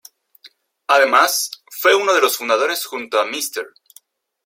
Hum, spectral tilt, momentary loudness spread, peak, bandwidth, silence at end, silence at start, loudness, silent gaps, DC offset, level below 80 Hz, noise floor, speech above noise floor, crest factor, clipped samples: none; 0.5 dB/octave; 13 LU; 0 dBFS; 16.5 kHz; 0.8 s; 0.45 s; -17 LUFS; none; under 0.1%; -76 dBFS; -52 dBFS; 34 dB; 18 dB; under 0.1%